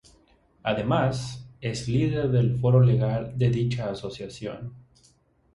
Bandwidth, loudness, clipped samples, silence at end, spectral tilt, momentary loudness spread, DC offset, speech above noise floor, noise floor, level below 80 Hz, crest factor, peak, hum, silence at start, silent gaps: 11 kHz; -25 LUFS; under 0.1%; 0.75 s; -7.5 dB/octave; 16 LU; under 0.1%; 38 dB; -62 dBFS; -50 dBFS; 18 dB; -8 dBFS; none; 0.65 s; none